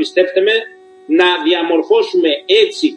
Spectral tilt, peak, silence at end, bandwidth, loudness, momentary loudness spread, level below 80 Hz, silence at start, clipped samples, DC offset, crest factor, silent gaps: -3 dB/octave; 0 dBFS; 0 s; 10 kHz; -13 LUFS; 4 LU; -66 dBFS; 0 s; under 0.1%; under 0.1%; 14 dB; none